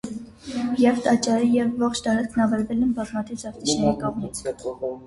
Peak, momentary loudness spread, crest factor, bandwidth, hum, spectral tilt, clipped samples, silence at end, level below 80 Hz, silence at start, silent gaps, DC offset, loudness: -8 dBFS; 11 LU; 16 dB; 11.5 kHz; none; -5 dB/octave; under 0.1%; 0 s; -50 dBFS; 0.05 s; none; under 0.1%; -23 LUFS